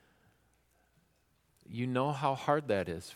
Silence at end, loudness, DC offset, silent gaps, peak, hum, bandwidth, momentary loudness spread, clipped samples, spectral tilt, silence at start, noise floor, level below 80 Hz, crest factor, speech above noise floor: 0 s; -33 LUFS; under 0.1%; none; -14 dBFS; none; 15.5 kHz; 7 LU; under 0.1%; -6.5 dB/octave; 1.7 s; -73 dBFS; -68 dBFS; 22 dB; 40 dB